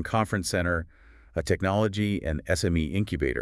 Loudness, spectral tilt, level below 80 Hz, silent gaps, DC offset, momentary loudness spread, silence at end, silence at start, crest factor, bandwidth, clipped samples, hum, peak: -27 LUFS; -5.5 dB/octave; -42 dBFS; none; under 0.1%; 6 LU; 0 s; 0 s; 16 dB; 12 kHz; under 0.1%; none; -10 dBFS